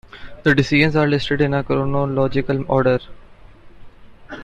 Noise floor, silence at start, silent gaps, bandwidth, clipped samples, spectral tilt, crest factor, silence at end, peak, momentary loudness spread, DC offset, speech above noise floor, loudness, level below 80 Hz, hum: -42 dBFS; 0.15 s; none; 8.2 kHz; under 0.1%; -7 dB/octave; 18 dB; 0 s; -2 dBFS; 6 LU; under 0.1%; 25 dB; -18 LUFS; -40 dBFS; none